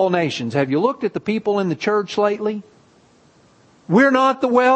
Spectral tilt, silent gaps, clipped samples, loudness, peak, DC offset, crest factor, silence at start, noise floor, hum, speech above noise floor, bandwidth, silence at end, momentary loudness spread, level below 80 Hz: -6 dB/octave; none; under 0.1%; -19 LUFS; -2 dBFS; under 0.1%; 16 dB; 0 s; -53 dBFS; none; 35 dB; 8.6 kHz; 0 s; 9 LU; -64 dBFS